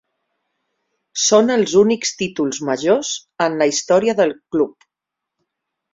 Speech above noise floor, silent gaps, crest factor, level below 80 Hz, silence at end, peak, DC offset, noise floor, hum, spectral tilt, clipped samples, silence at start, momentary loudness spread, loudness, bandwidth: 66 dB; none; 18 dB; -60 dBFS; 1.25 s; -2 dBFS; under 0.1%; -83 dBFS; none; -3.5 dB/octave; under 0.1%; 1.15 s; 8 LU; -17 LUFS; 7.8 kHz